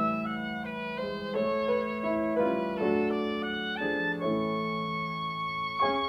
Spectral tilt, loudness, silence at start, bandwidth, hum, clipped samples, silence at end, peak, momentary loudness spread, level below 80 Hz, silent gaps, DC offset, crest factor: -7 dB/octave; -30 LUFS; 0 s; 13 kHz; none; under 0.1%; 0 s; -14 dBFS; 6 LU; -62 dBFS; none; under 0.1%; 16 dB